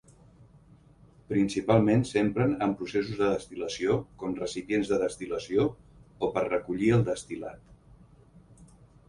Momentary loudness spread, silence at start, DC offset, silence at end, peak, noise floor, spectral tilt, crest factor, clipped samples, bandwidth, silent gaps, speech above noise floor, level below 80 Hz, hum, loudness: 10 LU; 1.3 s; under 0.1%; 0.45 s; -8 dBFS; -57 dBFS; -6.5 dB/octave; 20 dB; under 0.1%; 11.5 kHz; none; 29 dB; -56 dBFS; none; -28 LUFS